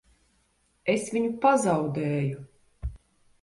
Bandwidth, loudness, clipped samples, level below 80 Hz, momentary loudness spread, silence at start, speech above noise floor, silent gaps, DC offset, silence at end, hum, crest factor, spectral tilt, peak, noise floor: 11.5 kHz; -26 LUFS; under 0.1%; -48 dBFS; 18 LU; 0.85 s; 44 dB; none; under 0.1%; 0.45 s; none; 20 dB; -6 dB/octave; -8 dBFS; -69 dBFS